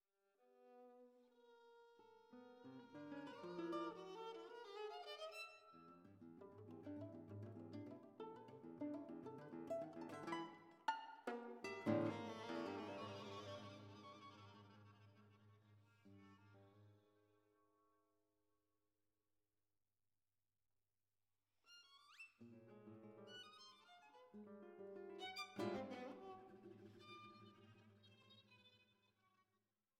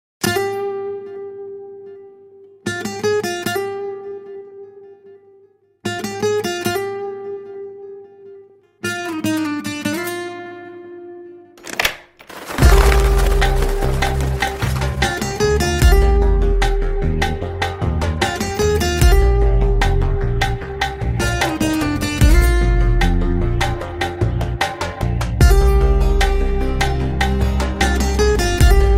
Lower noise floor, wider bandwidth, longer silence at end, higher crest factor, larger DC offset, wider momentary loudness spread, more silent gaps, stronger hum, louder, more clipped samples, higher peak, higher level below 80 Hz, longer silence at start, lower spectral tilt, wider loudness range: first, under -90 dBFS vs -52 dBFS; second, 13 kHz vs 16 kHz; first, 0.55 s vs 0 s; first, 26 dB vs 16 dB; neither; about the same, 20 LU vs 19 LU; neither; neither; second, -53 LUFS vs -18 LUFS; neither; second, -28 dBFS vs 0 dBFS; second, under -90 dBFS vs -20 dBFS; first, 0.4 s vs 0.2 s; about the same, -6 dB/octave vs -5 dB/octave; first, 17 LU vs 8 LU